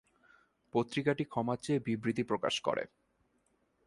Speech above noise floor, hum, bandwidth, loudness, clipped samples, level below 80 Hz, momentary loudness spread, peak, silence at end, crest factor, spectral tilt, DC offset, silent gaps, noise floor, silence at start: 42 dB; none; 11.5 kHz; -34 LUFS; under 0.1%; -72 dBFS; 4 LU; -16 dBFS; 1 s; 20 dB; -5.5 dB/octave; under 0.1%; none; -75 dBFS; 0.75 s